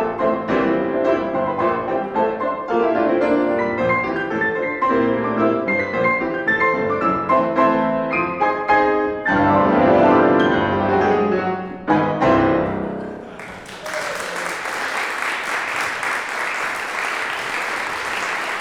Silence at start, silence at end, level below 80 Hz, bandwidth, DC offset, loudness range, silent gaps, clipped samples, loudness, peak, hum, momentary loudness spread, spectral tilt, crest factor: 0 s; 0 s; -48 dBFS; 16 kHz; under 0.1%; 6 LU; none; under 0.1%; -19 LUFS; -2 dBFS; none; 9 LU; -5.5 dB/octave; 16 dB